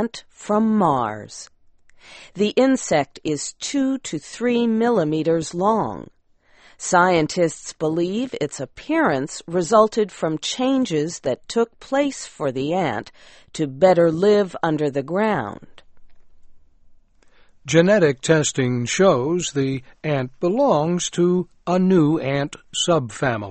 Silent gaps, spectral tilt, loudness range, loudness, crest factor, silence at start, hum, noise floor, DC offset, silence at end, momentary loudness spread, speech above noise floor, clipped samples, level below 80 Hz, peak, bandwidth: none; -5 dB/octave; 3 LU; -20 LUFS; 18 dB; 0 s; none; -55 dBFS; under 0.1%; 0 s; 11 LU; 35 dB; under 0.1%; -56 dBFS; -2 dBFS; 8.8 kHz